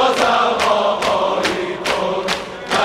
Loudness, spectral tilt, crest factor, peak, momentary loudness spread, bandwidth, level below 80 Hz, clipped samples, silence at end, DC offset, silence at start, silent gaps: -17 LUFS; -3 dB/octave; 16 dB; 0 dBFS; 6 LU; 16 kHz; -48 dBFS; under 0.1%; 0 s; under 0.1%; 0 s; none